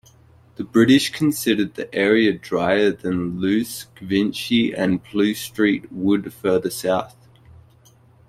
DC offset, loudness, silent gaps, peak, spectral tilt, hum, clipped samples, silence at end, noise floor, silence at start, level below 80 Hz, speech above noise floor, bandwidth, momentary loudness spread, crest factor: under 0.1%; -20 LUFS; none; -4 dBFS; -5 dB/octave; none; under 0.1%; 1.2 s; -52 dBFS; 0.6 s; -56 dBFS; 33 dB; 16 kHz; 8 LU; 18 dB